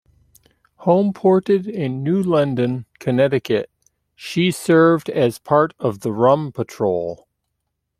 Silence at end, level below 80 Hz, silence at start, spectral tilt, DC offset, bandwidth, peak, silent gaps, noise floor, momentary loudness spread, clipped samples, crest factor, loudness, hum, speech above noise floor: 0.85 s; -60 dBFS; 0.8 s; -7 dB/octave; under 0.1%; 15 kHz; -2 dBFS; none; -76 dBFS; 10 LU; under 0.1%; 18 dB; -19 LUFS; 50 Hz at -50 dBFS; 58 dB